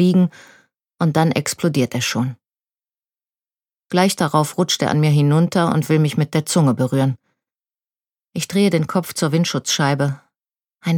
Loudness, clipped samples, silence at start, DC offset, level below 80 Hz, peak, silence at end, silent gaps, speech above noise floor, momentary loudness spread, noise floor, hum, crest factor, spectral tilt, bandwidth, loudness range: -18 LUFS; under 0.1%; 0 s; under 0.1%; -64 dBFS; -2 dBFS; 0 s; none; over 73 dB; 7 LU; under -90 dBFS; none; 18 dB; -5.5 dB/octave; 17 kHz; 5 LU